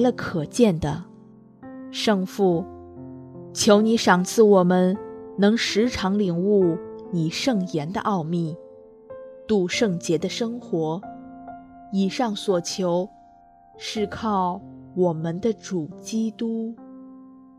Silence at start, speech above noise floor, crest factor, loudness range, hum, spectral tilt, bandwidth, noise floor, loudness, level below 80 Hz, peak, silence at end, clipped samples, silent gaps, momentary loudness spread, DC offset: 0 s; 30 dB; 20 dB; 7 LU; none; -5.5 dB/octave; 14 kHz; -52 dBFS; -23 LUFS; -56 dBFS; -2 dBFS; 0.3 s; under 0.1%; none; 22 LU; under 0.1%